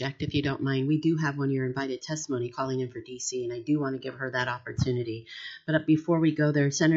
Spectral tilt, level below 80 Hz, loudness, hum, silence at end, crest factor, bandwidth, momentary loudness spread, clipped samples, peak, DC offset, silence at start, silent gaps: -6 dB/octave; -58 dBFS; -28 LUFS; none; 0 s; 16 dB; 7.8 kHz; 9 LU; under 0.1%; -12 dBFS; under 0.1%; 0 s; none